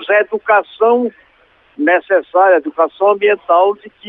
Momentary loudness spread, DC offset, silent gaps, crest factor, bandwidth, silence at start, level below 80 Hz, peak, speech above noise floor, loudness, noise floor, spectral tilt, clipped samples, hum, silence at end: 5 LU; under 0.1%; none; 12 dB; 4 kHz; 0 s; -66 dBFS; -2 dBFS; 38 dB; -13 LUFS; -52 dBFS; -7 dB/octave; under 0.1%; none; 0 s